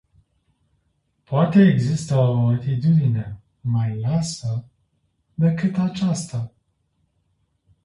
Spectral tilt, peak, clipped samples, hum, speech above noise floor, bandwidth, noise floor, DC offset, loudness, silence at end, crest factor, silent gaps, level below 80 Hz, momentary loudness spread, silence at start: -7.5 dB/octave; -4 dBFS; under 0.1%; none; 50 dB; 11.5 kHz; -69 dBFS; under 0.1%; -21 LUFS; 1.35 s; 16 dB; none; -54 dBFS; 15 LU; 1.3 s